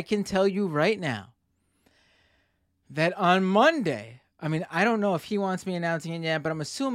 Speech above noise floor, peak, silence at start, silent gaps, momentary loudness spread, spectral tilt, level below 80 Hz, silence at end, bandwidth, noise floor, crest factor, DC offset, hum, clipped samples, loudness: 46 dB; -6 dBFS; 0 s; none; 10 LU; -5.5 dB/octave; -66 dBFS; 0 s; 14.5 kHz; -72 dBFS; 20 dB; under 0.1%; none; under 0.1%; -26 LUFS